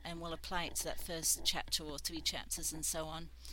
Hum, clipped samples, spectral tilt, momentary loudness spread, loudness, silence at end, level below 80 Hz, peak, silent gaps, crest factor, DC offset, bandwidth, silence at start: none; under 0.1%; -1.5 dB/octave; 10 LU; -37 LUFS; 0 s; -52 dBFS; -18 dBFS; none; 22 dB; under 0.1%; 17 kHz; 0 s